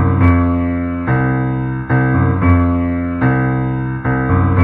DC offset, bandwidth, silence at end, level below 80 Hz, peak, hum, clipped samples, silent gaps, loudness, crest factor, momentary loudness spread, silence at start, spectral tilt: under 0.1%; 3.9 kHz; 0 s; -32 dBFS; 0 dBFS; none; under 0.1%; none; -15 LUFS; 14 dB; 6 LU; 0 s; -12 dB/octave